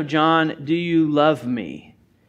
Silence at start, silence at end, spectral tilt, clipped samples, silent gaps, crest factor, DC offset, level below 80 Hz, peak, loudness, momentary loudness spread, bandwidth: 0 s; 0.5 s; -7 dB/octave; under 0.1%; none; 16 dB; under 0.1%; -62 dBFS; -4 dBFS; -19 LUFS; 13 LU; 7.8 kHz